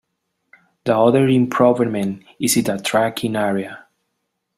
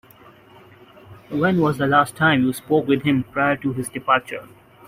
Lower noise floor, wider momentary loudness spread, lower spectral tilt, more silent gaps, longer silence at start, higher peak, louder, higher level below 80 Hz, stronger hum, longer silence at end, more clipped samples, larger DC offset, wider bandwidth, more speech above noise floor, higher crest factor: first, -74 dBFS vs -48 dBFS; about the same, 11 LU vs 9 LU; about the same, -5 dB/octave vs -6 dB/octave; neither; second, 0.85 s vs 1.1 s; about the same, -2 dBFS vs -4 dBFS; about the same, -18 LUFS vs -20 LUFS; about the same, -58 dBFS vs -56 dBFS; neither; first, 0.8 s vs 0.45 s; neither; neither; about the same, 15.5 kHz vs 16 kHz; first, 57 dB vs 29 dB; about the same, 18 dB vs 18 dB